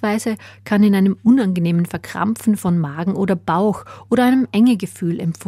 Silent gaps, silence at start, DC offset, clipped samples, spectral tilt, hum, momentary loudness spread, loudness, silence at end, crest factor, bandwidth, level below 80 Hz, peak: none; 0 s; under 0.1%; under 0.1%; -7 dB/octave; none; 8 LU; -18 LUFS; 0.05 s; 14 dB; 15 kHz; -54 dBFS; -4 dBFS